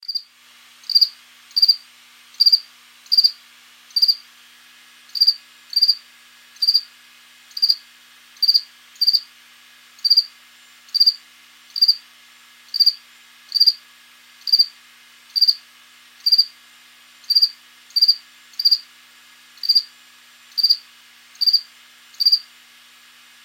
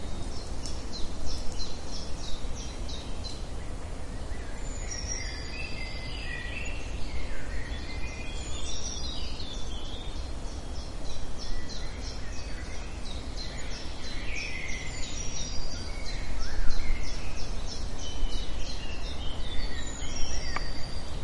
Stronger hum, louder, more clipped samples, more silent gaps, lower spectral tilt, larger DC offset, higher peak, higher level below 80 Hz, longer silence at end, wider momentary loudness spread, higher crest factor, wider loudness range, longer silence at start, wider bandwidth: neither; first, -16 LUFS vs -37 LUFS; neither; neither; second, 4.5 dB/octave vs -3.5 dB/octave; neither; first, 0 dBFS vs -8 dBFS; second, under -90 dBFS vs -34 dBFS; first, 1.05 s vs 0 s; first, 13 LU vs 5 LU; about the same, 20 dB vs 20 dB; about the same, 3 LU vs 3 LU; about the same, 0.1 s vs 0 s; first, 17.5 kHz vs 11 kHz